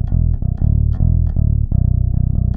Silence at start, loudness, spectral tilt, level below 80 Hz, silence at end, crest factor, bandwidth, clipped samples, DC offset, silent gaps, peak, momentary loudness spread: 0 s; -17 LUFS; -13.5 dB/octave; -18 dBFS; 0 s; 10 dB; 1.8 kHz; under 0.1%; under 0.1%; none; -4 dBFS; 2 LU